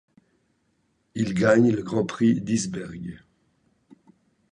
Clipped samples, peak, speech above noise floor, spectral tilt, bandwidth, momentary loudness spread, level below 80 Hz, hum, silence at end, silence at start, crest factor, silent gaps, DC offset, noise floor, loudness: under 0.1%; -6 dBFS; 47 dB; -6 dB/octave; 10.5 kHz; 19 LU; -58 dBFS; none; 1.35 s; 1.15 s; 20 dB; none; under 0.1%; -70 dBFS; -23 LUFS